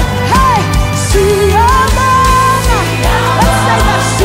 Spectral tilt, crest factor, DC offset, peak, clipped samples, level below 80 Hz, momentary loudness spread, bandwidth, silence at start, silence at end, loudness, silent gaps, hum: -4.5 dB/octave; 10 dB; under 0.1%; 0 dBFS; under 0.1%; -16 dBFS; 4 LU; 16.5 kHz; 0 s; 0 s; -9 LUFS; none; none